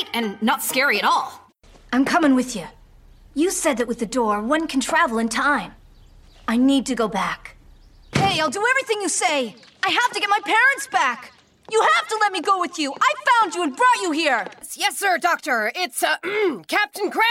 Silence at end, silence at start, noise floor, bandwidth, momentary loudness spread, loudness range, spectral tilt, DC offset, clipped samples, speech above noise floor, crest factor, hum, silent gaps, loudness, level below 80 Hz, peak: 0 s; 0 s; -48 dBFS; 16.5 kHz; 7 LU; 3 LU; -3 dB/octave; under 0.1%; under 0.1%; 28 dB; 16 dB; none; none; -20 LUFS; -54 dBFS; -4 dBFS